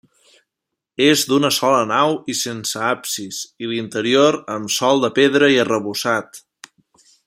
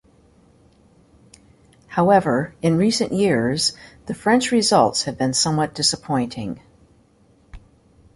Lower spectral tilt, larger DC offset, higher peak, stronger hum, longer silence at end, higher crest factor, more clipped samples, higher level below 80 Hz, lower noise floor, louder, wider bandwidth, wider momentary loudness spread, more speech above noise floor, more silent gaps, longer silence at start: about the same, -3.5 dB/octave vs -4 dB/octave; neither; about the same, -2 dBFS vs -4 dBFS; neither; first, 0.85 s vs 0.55 s; about the same, 18 dB vs 18 dB; neither; second, -64 dBFS vs -52 dBFS; first, -81 dBFS vs -56 dBFS; about the same, -17 LUFS vs -19 LUFS; first, 16 kHz vs 11.5 kHz; about the same, 11 LU vs 12 LU; first, 64 dB vs 37 dB; neither; second, 1 s vs 1.9 s